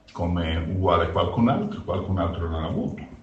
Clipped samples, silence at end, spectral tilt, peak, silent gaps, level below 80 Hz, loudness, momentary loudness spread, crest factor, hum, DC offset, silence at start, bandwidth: under 0.1%; 0 s; -8.5 dB/octave; -8 dBFS; none; -38 dBFS; -25 LUFS; 7 LU; 18 dB; none; under 0.1%; 0.1 s; 7.4 kHz